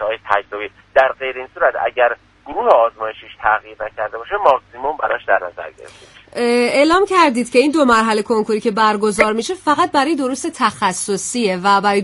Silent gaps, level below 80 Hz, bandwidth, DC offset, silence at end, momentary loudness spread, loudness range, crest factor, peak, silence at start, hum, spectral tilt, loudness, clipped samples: none; -52 dBFS; 11.5 kHz; under 0.1%; 0 s; 12 LU; 5 LU; 16 dB; 0 dBFS; 0 s; none; -3.5 dB/octave; -16 LUFS; under 0.1%